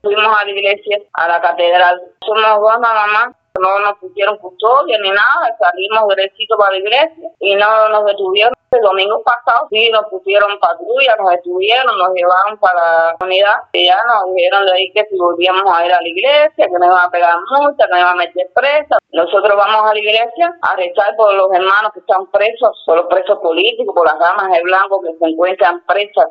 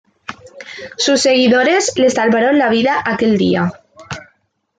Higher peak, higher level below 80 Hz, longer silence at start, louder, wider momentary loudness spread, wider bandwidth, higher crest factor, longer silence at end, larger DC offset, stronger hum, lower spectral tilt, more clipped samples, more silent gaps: about the same, 0 dBFS vs -2 dBFS; second, -62 dBFS vs -56 dBFS; second, 0.05 s vs 0.3 s; about the same, -12 LUFS vs -13 LUFS; second, 5 LU vs 21 LU; second, 5.4 kHz vs 9.4 kHz; about the same, 12 dB vs 14 dB; second, 0 s vs 0.55 s; neither; neither; about the same, -4 dB/octave vs -4 dB/octave; neither; neither